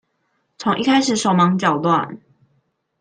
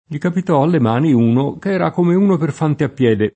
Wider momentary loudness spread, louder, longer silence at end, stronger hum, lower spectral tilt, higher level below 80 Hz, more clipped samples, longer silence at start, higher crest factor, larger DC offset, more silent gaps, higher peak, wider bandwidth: about the same, 7 LU vs 5 LU; about the same, -17 LUFS vs -16 LUFS; first, 0.85 s vs 0.05 s; neither; second, -5 dB/octave vs -8.5 dB/octave; second, -62 dBFS vs -56 dBFS; neither; first, 0.6 s vs 0.1 s; about the same, 16 dB vs 14 dB; neither; neither; about the same, -2 dBFS vs -2 dBFS; first, 9.8 kHz vs 8.6 kHz